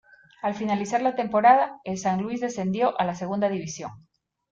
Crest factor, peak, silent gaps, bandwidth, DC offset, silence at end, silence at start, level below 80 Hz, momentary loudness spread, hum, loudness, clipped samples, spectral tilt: 20 dB; -6 dBFS; none; 7.8 kHz; under 0.1%; 0.5 s; 0.45 s; -64 dBFS; 13 LU; none; -24 LUFS; under 0.1%; -5.5 dB/octave